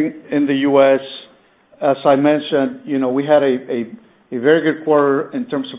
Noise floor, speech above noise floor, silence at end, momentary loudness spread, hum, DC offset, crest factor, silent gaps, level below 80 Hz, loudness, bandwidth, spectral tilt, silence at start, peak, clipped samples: -51 dBFS; 35 dB; 0 s; 11 LU; none; under 0.1%; 16 dB; none; -64 dBFS; -16 LUFS; 4 kHz; -10 dB/octave; 0 s; 0 dBFS; under 0.1%